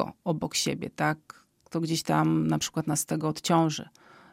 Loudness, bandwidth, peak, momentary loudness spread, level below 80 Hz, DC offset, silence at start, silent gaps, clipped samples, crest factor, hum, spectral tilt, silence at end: -28 LUFS; 16 kHz; -10 dBFS; 10 LU; -62 dBFS; under 0.1%; 0 s; none; under 0.1%; 18 dB; none; -4.5 dB/octave; 0.45 s